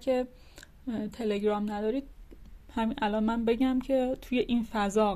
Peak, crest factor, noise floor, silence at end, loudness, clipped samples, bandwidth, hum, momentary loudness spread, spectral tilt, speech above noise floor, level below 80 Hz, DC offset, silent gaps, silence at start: -14 dBFS; 14 dB; -49 dBFS; 0 s; -30 LUFS; under 0.1%; 14.5 kHz; none; 9 LU; -6 dB/octave; 20 dB; -50 dBFS; under 0.1%; none; 0 s